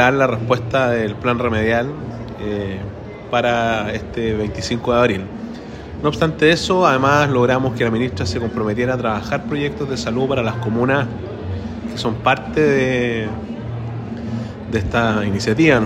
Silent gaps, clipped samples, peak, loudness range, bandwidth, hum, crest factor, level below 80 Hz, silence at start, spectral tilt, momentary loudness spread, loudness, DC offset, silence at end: none; under 0.1%; 0 dBFS; 4 LU; 13.5 kHz; none; 18 dB; -40 dBFS; 0 s; -6 dB/octave; 13 LU; -19 LUFS; under 0.1%; 0 s